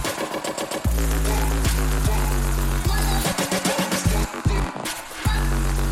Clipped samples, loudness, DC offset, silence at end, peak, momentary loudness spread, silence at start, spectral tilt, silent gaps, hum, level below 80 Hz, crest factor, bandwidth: under 0.1%; -23 LUFS; under 0.1%; 0 s; -8 dBFS; 5 LU; 0 s; -4.5 dB/octave; none; none; -24 dBFS; 14 dB; 16.5 kHz